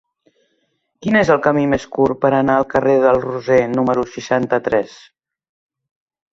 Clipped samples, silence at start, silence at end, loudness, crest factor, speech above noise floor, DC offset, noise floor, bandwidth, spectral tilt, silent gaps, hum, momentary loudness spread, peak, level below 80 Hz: under 0.1%; 1 s; 1.45 s; -16 LUFS; 16 dB; 52 dB; under 0.1%; -67 dBFS; 7.6 kHz; -6.5 dB/octave; none; none; 6 LU; -2 dBFS; -50 dBFS